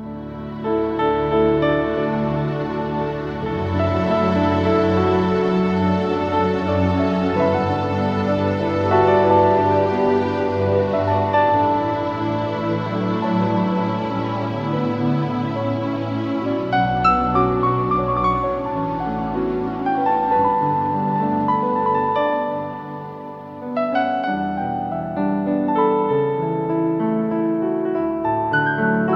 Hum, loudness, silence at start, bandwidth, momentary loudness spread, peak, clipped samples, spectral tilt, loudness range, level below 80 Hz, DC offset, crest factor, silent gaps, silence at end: none; -20 LUFS; 0 s; 7.4 kHz; 7 LU; -4 dBFS; under 0.1%; -8.5 dB/octave; 4 LU; -44 dBFS; under 0.1%; 16 dB; none; 0 s